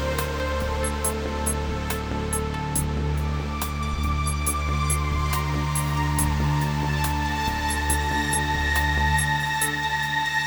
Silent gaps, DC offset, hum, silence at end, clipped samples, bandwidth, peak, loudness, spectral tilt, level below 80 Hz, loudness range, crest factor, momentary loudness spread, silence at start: none; under 0.1%; none; 0 s; under 0.1%; over 20 kHz; -10 dBFS; -24 LUFS; -4 dB/octave; -30 dBFS; 3 LU; 14 dB; 5 LU; 0 s